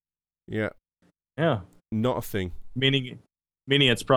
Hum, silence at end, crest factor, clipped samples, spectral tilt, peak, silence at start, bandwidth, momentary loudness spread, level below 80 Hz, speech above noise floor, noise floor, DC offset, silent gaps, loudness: none; 0 s; 20 dB; under 0.1%; -5.5 dB/octave; -6 dBFS; 0.5 s; 18 kHz; 14 LU; -52 dBFS; 44 dB; -69 dBFS; under 0.1%; none; -26 LUFS